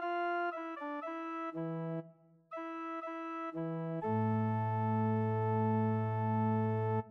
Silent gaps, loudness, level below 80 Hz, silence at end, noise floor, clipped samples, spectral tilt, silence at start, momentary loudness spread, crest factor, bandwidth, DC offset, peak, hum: none; -36 LUFS; -76 dBFS; 0 s; -60 dBFS; under 0.1%; -10 dB/octave; 0 s; 9 LU; 14 dB; 4.4 kHz; under 0.1%; -22 dBFS; none